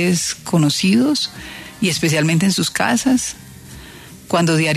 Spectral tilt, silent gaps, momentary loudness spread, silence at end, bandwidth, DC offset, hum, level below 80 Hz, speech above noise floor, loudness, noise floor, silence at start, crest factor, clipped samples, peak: -4.5 dB/octave; none; 21 LU; 0 s; 13.5 kHz; under 0.1%; none; -50 dBFS; 22 dB; -17 LUFS; -38 dBFS; 0 s; 14 dB; under 0.1%; -4 dBFS